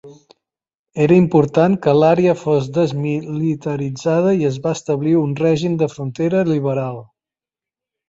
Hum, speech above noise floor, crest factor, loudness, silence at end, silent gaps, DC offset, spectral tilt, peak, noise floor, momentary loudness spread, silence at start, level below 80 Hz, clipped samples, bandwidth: none; 73 dB; 16 dB; -17 LUFS; 1.05 s; 0.79-0.85 s; under 0.1%; -7.5 dB/octave; -2 dBFS; -89 dBFS; 9 LU; 0.05 s; -54 dBFS; under 0.1%; 7.8 kHz